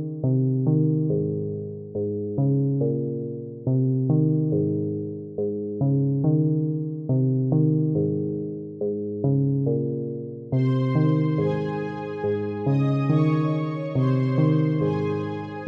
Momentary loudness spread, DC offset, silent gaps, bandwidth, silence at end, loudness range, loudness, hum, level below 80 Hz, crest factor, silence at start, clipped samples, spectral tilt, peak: 9 LU; under 0.1%; none; 5.2 kHz; 0 s; 2 LU; -24 LUFS; none; -62 dBFS; 14 dB; 0 s; under 0.1%; -11 dB/octave; -8 dBFS